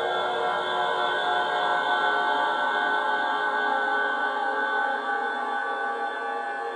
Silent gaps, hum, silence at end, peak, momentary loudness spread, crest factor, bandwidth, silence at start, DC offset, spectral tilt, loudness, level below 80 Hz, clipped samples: none; none; 0 s; -12 dBFS; 5 LU; 14 dB; 10 kHz; 0 s; under 0.1%; -2.5 dB/octave; -25 LUFS; -86 dBFS; under 0.1%